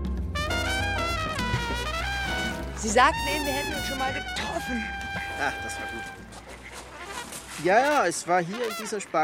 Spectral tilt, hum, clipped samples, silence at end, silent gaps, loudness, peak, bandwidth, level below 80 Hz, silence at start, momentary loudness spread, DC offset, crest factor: -3.5 dB/octave; none; under 0.1%; 0 s; none; -27 LUFS; -6 dBFS; 17 kHz; -40 dBFS; 0 s; 16 LU; under 0.1%; 22 dB